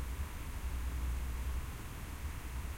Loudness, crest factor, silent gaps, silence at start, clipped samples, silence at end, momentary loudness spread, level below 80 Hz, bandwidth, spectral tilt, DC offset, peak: -42 LUFS; 10 dB; none; 0 s; under 0.1%; 0 s; 5 LU; -40 dBFS; 16.5 kHz; -5 dB/octave; under 0.1%; -28 dBFS